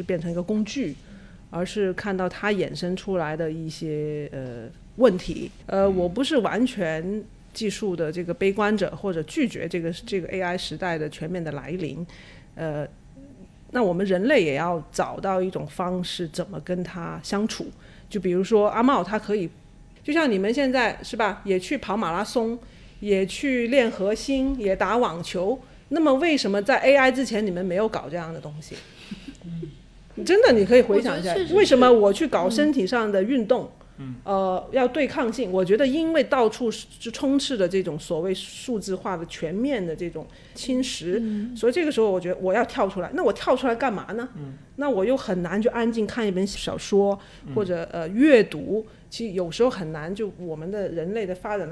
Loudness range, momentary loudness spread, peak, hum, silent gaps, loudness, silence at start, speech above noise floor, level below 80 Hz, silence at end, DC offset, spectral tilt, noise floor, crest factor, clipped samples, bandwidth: 8 LU; 14 LU; -4 dBFS; none; none; -24 LUFS; 0 s; 23 dB; -50 dBFS; 0 s; under 0.1%; -5.5 dB/octave; -46 dBFS; 20 dB; under 0.1%; 11 kHz